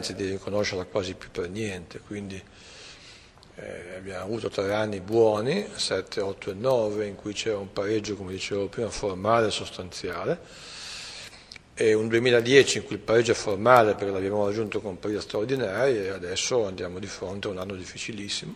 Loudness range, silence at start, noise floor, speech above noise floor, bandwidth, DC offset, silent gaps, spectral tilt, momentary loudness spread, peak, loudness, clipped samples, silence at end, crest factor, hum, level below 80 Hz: 11 LU; 0 s; -51 dBFS; 24 dB; 15.5 kHz; under 0.1%; none; -4.5 dB/octave; 17 LU; -2 dBFS; -26 LUFS; under 0.1%; 0 s; 24 dB; none; -54 dBFS